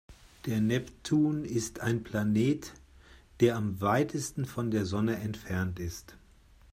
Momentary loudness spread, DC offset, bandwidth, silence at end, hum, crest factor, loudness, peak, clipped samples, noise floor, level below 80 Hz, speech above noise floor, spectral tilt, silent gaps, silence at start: 8 LU; under 0.1%; 16 kHz; 0.55 s; none; 20 dB; -31 LUFS; -12 dBFS; under 0.1%; -58 dBFS; -56 dBFS; 28 dB; -6 dB/octave; none; 0.1 s